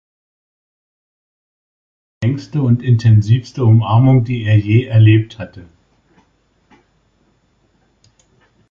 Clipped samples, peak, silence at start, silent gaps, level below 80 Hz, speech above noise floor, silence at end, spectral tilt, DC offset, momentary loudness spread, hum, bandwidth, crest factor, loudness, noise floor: under 0.1%; -2 dBFS; 2.2 s; none; -44 dBFS; 47 dB; 3.1 s; -8.5 dB/octave; under 0.1%; 10 LU; none; 6.8 kHz; 14 dB; -13 LUFS; -59 dBFS